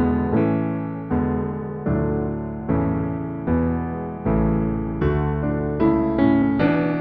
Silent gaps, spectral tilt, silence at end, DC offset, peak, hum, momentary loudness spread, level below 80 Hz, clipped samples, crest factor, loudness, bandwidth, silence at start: none; -11.5 dB/octave; 0 s; under 0.1%; -6 dBFS; none; 8 LU; -34 dBFS; under 0.1%; 14 dB; -22 LUFS; 4.9 kHz; 0 s